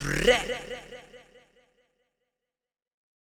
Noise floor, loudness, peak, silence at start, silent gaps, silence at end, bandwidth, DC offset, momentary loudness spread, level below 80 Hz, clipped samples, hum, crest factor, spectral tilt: under -90 dBFS; -25 LUFS; -8 dBFS; 0 s; none; 2.15 s; 18 kHz; under 0.1%; 23 LU; -46 dBFS; under 0.1%; none; 24 dB; -3.5 dB/octave